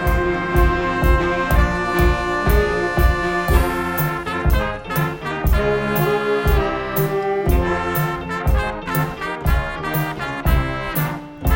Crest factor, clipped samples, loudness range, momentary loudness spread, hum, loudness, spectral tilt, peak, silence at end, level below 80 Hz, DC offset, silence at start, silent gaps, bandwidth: 16 dB; under 0.1%; 3 LU; 5 LU; none; -20 LUFS; -6.5 dB/octave; -2 dBFS; 0 s; -22 dBFS; under 0.1%; 0 s; none; 17 kHz